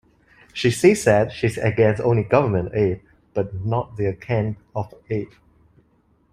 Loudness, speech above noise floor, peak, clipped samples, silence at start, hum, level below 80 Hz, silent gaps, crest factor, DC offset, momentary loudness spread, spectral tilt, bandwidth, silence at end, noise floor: -21 LUFS; 41 dB; -2 dBFS; under 0.1%; 0.55 s; none; -50 dBFS; none; 20 dB; under 0.1%; 13 LU; -6.5 dB/octave; 15 kHz; 1.05 s; -61 dBFS